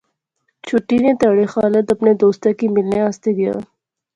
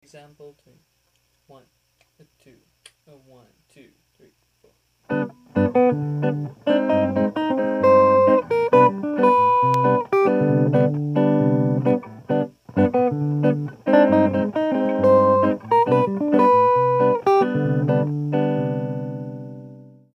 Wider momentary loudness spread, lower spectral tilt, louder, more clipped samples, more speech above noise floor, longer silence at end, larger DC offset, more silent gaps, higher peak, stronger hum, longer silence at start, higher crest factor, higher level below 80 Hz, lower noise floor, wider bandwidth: second, 7 LU vs 11 LU; second, -7.5 dB/octave vs -9 dB/octave; first, -16 LUFS vs -19 LUFS; neither; first, 55 dB vs 42 dB; first, 0.55 s vs 0.35 s; neither; neither; about the same, -2 dBFS vs -2 dBFS; neither; first, 0.65 s vs 0.15 s; about the same, 16 dB vs 18 dB; first, -54 dBFS vs -64 dBFS; first, -70 dBFS vs -66 dBFS; first, 8.8 kHz vs 6.4 kHz